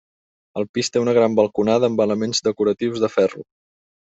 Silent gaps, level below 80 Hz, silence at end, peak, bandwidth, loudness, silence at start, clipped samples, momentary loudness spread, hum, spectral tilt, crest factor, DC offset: 0.69-0.74 s; -62 dBFS; 0.7 s; -4 dBFS; 8 kHz; -19 LUFS; 0.55 s; under 0.1%; 8 LU; none; -5 dB/octave; 18 dB; under 0.1%